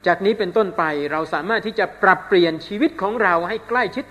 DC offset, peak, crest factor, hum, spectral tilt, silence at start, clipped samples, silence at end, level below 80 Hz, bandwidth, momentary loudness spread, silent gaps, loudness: under 0.1%; 0 dBFS; 18 dB; none; -6 dB/octave; 0.05 s; under 0.1%; 0.05 s; -56 dBFS; 13 kHz; 6 LU; none; -19 LUFS